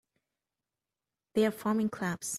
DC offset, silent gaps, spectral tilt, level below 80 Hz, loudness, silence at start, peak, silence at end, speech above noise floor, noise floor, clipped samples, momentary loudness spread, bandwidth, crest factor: under 0.1%; none; -5 dB/octave; -72 dBFS; -31 LUFS; 1.35 s; -16 dBFS; 0 s; over 60 dB; under -90 dBFS; under 0.1%; 6 LU; 15 kHz; 18 dB